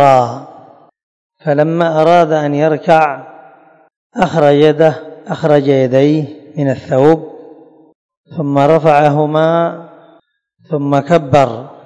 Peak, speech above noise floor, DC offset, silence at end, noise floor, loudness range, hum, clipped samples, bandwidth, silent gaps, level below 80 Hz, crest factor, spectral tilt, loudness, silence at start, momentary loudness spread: 0 dBFS; 42 dB; under 0.1%; 0.15 s; -53 dBFS; 2 LU; none; 0.9%; 11 kHz; 1.03-1.30 s, 3.96-4.10 s, 7.95-8.09 s, 8.17-8.24 s; -52 dBFS; 12 dB; -7.5 dB/octave; -12 LUFS; 0 s; 14 LU